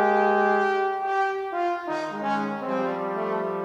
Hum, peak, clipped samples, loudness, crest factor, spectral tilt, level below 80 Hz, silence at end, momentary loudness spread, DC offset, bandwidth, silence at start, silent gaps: none; -10 dBFS; under 0.1%; -25 LUFS; 14 dB; -6 dB/octave; -72 dBFS; 0 s; 7 LU; under 0.1%; 8.6 kHz; 0 s; none